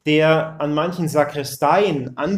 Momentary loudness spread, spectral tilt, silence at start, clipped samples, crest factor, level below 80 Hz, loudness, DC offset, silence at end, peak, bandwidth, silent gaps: 7 LU; -5.5 dB/octave; 0.05 s; under 0.1%; 16 dB; -56 dBFS; -19 LUFS; under 0.1%; 0 s; -2 dBFS; 16 kHz; none